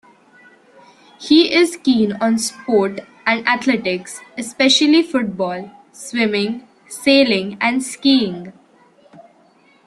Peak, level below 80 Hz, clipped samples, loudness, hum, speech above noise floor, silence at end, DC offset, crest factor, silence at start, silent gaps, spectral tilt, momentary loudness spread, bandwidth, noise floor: -2 dBFS; -62 dBFS; under 0.1%; -16 LUFS; none; 36 dB; 1.35 s; under 0.1%; 18 dB; 1.2 s; none; -3.5 dB/octave; 17 LU; 13 kHz; -53 dBFS